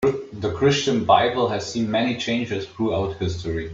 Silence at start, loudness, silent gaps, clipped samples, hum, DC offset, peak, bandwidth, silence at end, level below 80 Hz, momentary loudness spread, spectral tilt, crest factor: 0 s; -22 LUFS; none; under 0.1%; none; under 0.1%; -4 dBFS; 7.8 kHz; 0 s; -48 dBFS; 10 LU; -5.5 dB/octave; 18 dB